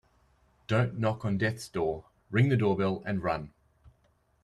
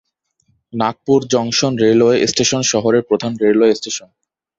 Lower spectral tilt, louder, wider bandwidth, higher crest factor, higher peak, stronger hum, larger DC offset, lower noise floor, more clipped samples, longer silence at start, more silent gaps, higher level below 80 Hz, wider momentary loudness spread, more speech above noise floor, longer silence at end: first, -7.5 dB/octave vs -4 dB/octave; second, -30 LUFS vs -15 LUFS; first, 12.5 kHz vs 8 kHz; about the same, 18 dB vs 14 dB; second, -14 dBFS vs -2 dBFS; neither; neither; first, -69 dBFS vs -63 dBFS; neither; about the same, 0.7 s vs 0.75 s; neither; about the same, -58 dBFS vs -54 dBFS; about the same, 10 LU vs 8 LU; second, 40 dB vs 49 dB; about the same, 0.55 s vs 0.6 s